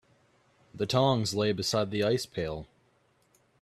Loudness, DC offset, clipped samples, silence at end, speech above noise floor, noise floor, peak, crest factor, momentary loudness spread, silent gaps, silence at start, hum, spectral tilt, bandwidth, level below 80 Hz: -29 LUFS; under 0.1%; under 0.1%; 0.95 s; 40 dB; -68 dBFS; -10 dBFS; 20 dB; 11 LU; none; 0.75 s; none; -5 dB/octave; 14.5 kHz; -60 dBFS